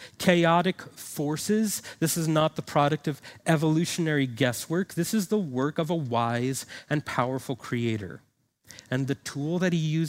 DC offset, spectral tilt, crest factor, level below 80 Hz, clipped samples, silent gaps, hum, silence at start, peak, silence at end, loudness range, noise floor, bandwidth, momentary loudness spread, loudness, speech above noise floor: under 0.1%; -5 dB/octave; 22 dB; -66 dBFS; under 0.1%; none; none; 0 s; -4 dBFS; 0 s; 4 LU; -54 dBFS; 16 kHz; 9 LU; -27 LUFS; 28 dB